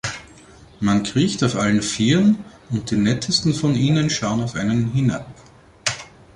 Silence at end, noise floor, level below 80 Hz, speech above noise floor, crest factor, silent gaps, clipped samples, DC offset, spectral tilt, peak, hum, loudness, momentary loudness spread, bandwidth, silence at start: 0.3 s; -46 dBFS; -48 dBFS; 27 dB; 16 dB; none; under 0.1%; under 0.1%; -5 dB/octave; -4 dBFS; none; -20 LUFS; 9 LU; 11.5 kHz; 0.05 s